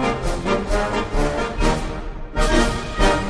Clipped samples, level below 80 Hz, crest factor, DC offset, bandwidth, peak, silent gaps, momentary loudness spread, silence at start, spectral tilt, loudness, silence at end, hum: under 0.1%; -24 dBFS; 16 dB; under 0.1%; 11 kHz; -4 dBFS; none; 7 LU; 0 s; -5 dB/octave; -22 LUFS; 0 s; none